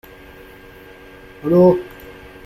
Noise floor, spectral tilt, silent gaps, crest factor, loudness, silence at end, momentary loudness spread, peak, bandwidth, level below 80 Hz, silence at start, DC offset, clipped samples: -41 dBFS; -9.5 dB/octave; none; 18 dB; -15 LUFS; 0.35 s; 25 LU; -2 dBFS; 15 kHz; -48 dBFS; 1.45 s; under 0.1%; under 0.1%